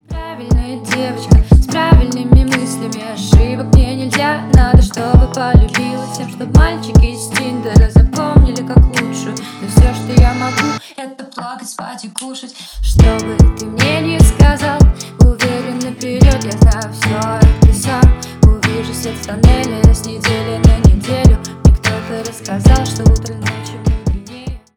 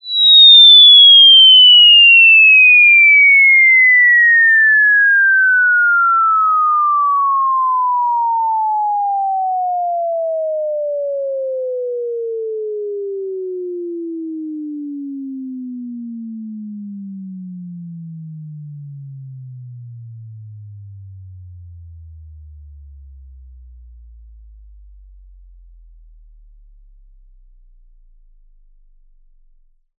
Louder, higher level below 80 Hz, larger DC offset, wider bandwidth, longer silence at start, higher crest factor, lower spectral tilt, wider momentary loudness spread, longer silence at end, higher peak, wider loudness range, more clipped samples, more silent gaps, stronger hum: second, -13 LUFS vs -7 LUFS; first, -14 dBFS vs -48 dBFS; neither; first, 14 kHz vs 4.2 kHz; about the same, 0.1 s vs 0.05 s; about the same, 12 dB vs 12 dB; first, -6 dB/octave vs 2.5 dB/octave; second, 13 LU vs 26 LU; second, 0.2 s vs 8.55 s; about the same, 0 dBFS vs 0 dBFS; second, 4 LU vs 26 LU; first, 1% vs under 0.1%; neither; neither